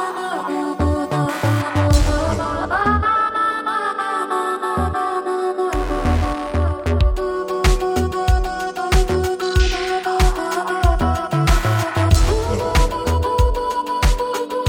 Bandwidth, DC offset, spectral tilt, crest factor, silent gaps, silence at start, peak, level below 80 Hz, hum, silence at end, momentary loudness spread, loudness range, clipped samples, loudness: 18 kHz; under 0.1%; -5.5 dB/octave; 16 dB; none; 0 s; 0 dBFS; -22 dBFS; none; 0 s; 5 LU; 2 LU; under 0.1%; -19 LUFS